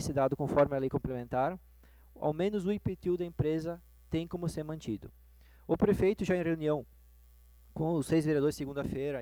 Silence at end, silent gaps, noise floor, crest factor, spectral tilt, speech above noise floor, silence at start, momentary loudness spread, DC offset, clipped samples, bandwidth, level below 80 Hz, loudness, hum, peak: 0 s; none; -58 dBFS; 20 dB; -7 dB/octave; 27 dB; 0 s; 11 LU; under 0.1%; under 0.1%; over 20 kHz; -54 dBFS; -32 LUFS; 60 Hz at -55 dBFS; -12 dBFS